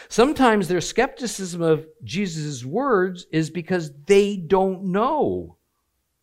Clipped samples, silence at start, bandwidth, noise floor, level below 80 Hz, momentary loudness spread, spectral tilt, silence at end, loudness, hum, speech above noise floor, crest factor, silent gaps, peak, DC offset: under 0.1%; 0 s; 15.5 kHz; -73 dBFS; -50 dBFS; 9 LU; -5.5 dB/octave; 0.75 s; -22 LUFS; none; 52 dB; 18 dB; none; -4 dBFS; under 0.1%